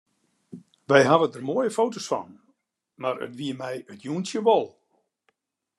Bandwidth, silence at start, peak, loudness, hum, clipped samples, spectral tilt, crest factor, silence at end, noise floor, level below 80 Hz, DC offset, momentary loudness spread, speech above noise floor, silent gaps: 12.5 kHz; 0.55 s; -2 dBFS; -24 LUFS; none; under 0.1%; -5 dB/octave; 24 dB; 1.1 s; -73 dBFS; -74 dBFS; under 0.1%; 15 LU; 49 dB; none